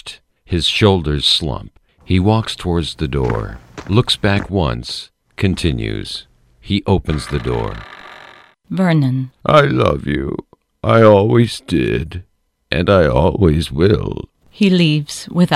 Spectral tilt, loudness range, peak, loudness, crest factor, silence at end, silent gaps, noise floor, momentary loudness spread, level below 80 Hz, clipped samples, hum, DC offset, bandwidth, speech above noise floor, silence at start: -6 dB/octave; 6 LU; 0 dBFS; -16 LUFS; 16 dB; 0 s; none; -43 dBFS; 17 LU; -32 dBFS; under 0.1%; none; under 0.1%; 14 kHz; 28 dB; 0.05 s